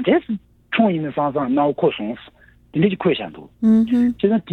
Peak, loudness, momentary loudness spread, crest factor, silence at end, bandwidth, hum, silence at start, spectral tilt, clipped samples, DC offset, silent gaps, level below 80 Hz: -4 dBFS; -19 LUFS; 13 LU; 16 dB; 0 s; 4.2 kHz; none; 0 s; -8.5 dB/octave; under 0.1%; under 0.1%; none; -54 dBFS